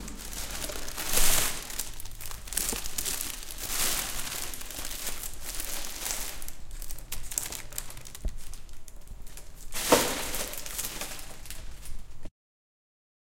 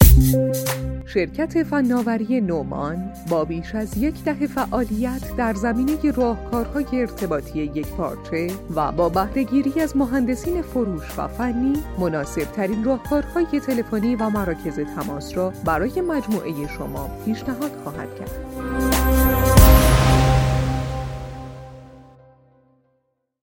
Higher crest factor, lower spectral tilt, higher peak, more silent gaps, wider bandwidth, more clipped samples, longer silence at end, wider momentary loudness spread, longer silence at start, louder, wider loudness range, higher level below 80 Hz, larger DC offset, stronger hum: first, 26 dB vs 20 dB; second, -1.5 dB/octave vs -6 dB/octave; second, -6 dBFS vs 0 dBFS; neither; about the same, 17 kHz vs 17 kHz; neither; second, 1 s vs 1.4 s; first, 22 LU vs 12 LU; about the same, 0 s vs 0 s; second, -31 LUFS vs -22 LUFS; about the same, 7 LU vs 7 LU; second, -38 dBFS vs -26 dBFS; neither; neither